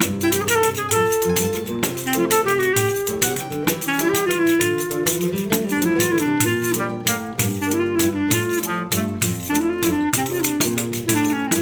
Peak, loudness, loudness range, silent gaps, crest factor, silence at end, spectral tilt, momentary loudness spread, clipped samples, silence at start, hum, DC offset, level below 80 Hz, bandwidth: -4 dBFS; -20 LUFS; 1 LU; none; 18 dB; 0 s; -4 dB/octave; 4 LU; under 0.1%; 0 s; none; under 0.1%; -54 dBFS; over 20 kHz